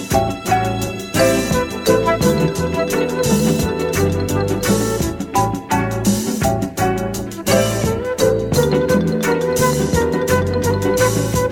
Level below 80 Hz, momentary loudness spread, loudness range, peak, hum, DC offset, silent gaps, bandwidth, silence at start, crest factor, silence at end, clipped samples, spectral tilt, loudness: -34 dBFS; 4 LU; 2 LU; -2 dBFS; none; under 0.1%; none; 19 kHz; 0 s; 16 dB; 0 s; under 0.1%; -5 dB/octave; -17 LUFS